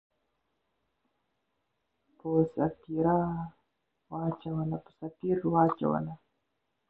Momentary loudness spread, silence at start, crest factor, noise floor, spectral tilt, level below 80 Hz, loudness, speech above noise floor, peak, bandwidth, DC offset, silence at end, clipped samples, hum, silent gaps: 16 LU; 2.25 s; 22 dB; -81 dBFS; -12 dB/octave; -62 dBFS; -31 LUFS; 51 dB; -10 dBFS; 4.1 kHz; under 0.1%; 0.75 s; under 0.1%; none; none